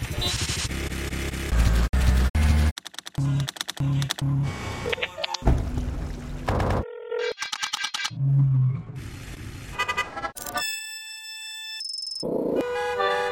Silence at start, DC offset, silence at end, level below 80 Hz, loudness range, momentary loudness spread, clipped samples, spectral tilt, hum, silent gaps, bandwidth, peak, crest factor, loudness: 0 s; under 0.1%; 0 s; -30 dBFS; 4 LU; 12 LU; under 0.1%; -5 dB/octave; none; 1.89-1.93 s, 2.30-2.34 s, 2.71-2.76 s; 16.5 kHz; -6 dBFS; 20 dB; -26 LUFS